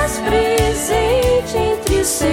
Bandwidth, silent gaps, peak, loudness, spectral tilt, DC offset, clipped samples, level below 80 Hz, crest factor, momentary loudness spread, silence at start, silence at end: 17 kHz; none; -2 dBFS; -16 LUFS; -4 dB/octave; under 0.1%; under 0.1%; -28 dBFS; 14 dB; 2 LU; 0 s; 0 s